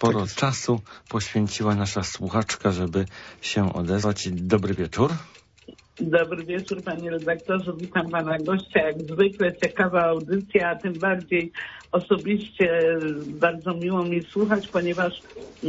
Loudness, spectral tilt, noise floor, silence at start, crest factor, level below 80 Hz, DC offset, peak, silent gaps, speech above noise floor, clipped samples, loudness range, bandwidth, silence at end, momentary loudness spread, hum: -25 LUFS; -5.5 dB/octave; -50 dBFS; 0 s; 18 dB; -54 dBFS; under 0.1%; -6 dBFS; none; 25 dB; under 0.1%; 3 LU; 8 kHz; 0 s; 8 LU; none